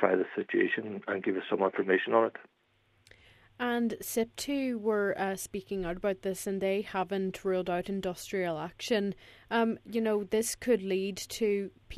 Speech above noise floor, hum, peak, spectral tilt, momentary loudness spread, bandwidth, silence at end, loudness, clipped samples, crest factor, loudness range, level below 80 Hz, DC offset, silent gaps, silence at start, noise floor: 38 dB; none; -8 dBFS; -4.5 dB/octave; 7 LU; 14 kHz; 0 s; -31 LUFS; under 0.1%; 22 dB; 2 LU; -60 dBFS; under 0.1%; none; 0 s; -70 dBFS